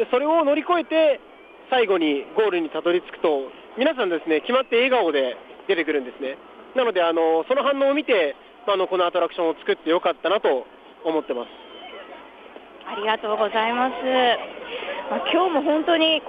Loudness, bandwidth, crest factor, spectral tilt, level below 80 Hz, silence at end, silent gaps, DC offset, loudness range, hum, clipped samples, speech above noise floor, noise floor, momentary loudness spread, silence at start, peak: -22 LUFS; 5 kHz; 16 dB; -6 dB/octave; -68 dBFS; 0 s; none; under 0.1%; 4 LU; none; under 0.1%; 22 dB; -43 dBFS; 13 LU; 0 s; -6 dBFS